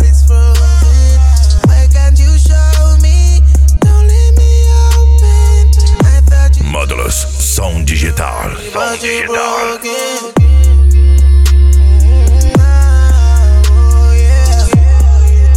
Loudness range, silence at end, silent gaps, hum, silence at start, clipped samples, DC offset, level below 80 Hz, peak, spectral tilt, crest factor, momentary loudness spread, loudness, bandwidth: 5 LU; 0 s; none; none; 0 s; under 0.1%; under 0.1%; -6 dBFS; 0 dBFS; -5.5 dB/octave; 6 dB; 7 LU; -9 LUFS; 13.5 kHz